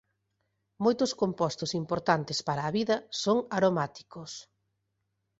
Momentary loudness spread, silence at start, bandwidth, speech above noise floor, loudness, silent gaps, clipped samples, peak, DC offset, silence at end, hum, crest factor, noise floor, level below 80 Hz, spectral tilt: 15 LU; 0.8 s; 8.2 kHz; 51 dB; -29 LUFS; none; under 0.1%; -8 dBFS; under 0.1%; 1 s; none; 22 dB; -80 dBFS; -68 dBFS; -5 dB/octave